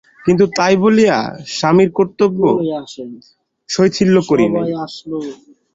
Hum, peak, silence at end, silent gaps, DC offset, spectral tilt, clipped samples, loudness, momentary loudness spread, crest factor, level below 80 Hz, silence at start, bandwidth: none; 0 dBFS; 0.4 s; none; under 0.1%; -6 dB/octave; under 0.1%; -15 LUFS; 14 LU; 14 dB; -52 dBFS; 0.25 s; 7.8 kHz